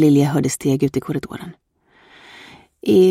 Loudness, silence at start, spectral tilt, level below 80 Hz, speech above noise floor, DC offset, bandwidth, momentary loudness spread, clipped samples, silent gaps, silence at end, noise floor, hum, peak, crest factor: -19 LUFS; 0 s; -6.5 dB/octave; -54 dBFS; 37 dB; under 0.1%; 15.5 kHz; 26 LU; under 0.1%; none; 0 s; -53 dBFS; none; -4 dBFS; 14 dB